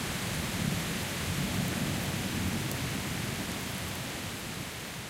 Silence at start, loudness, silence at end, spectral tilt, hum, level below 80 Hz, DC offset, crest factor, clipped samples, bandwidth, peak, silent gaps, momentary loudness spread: 0 s; -33 LUFS; 0 s; -4 dB/octave; none; -48 dBFS; under 0.1%; 18 dB; under 0.1%; 17 kHz; -16 dBFS; none; 5 LU